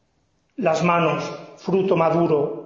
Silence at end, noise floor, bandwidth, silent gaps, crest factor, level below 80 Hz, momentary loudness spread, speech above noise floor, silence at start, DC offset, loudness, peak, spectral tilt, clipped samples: 0 s; -67 dBFS; 7.6 kHz; none; 16 dB; -62 dBFS; 14 LU; 47 dB; 0.6 s; under 0.1%; -20 LUFS; -6 dBFS; -7 dB/octave; under 0.1%